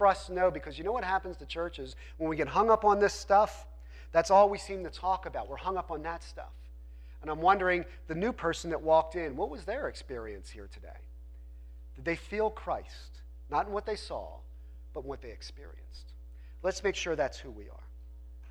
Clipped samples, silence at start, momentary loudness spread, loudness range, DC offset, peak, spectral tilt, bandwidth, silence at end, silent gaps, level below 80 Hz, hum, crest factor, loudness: under 0.1%; 0 s; 25 LU; 12 LU; under 0.1%; -12 dBFS; -5 dB/octave; 13.5 kHz; 0 s; none; -48 dBFS; none; 20 dB; -31 LUFS